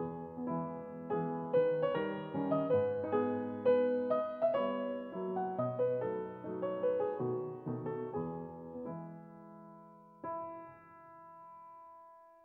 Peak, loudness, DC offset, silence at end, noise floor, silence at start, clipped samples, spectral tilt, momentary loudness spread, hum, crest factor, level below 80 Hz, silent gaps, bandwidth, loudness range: -20 dBFS; -36 LUFS; under 0.1%; 0.15 s; -58 dBFS; 0 s; under 0.1%; -10 dB/octave; 22 LU; none; 16 dB; -76 dBFS; none; 4.3 kHz; 14 LU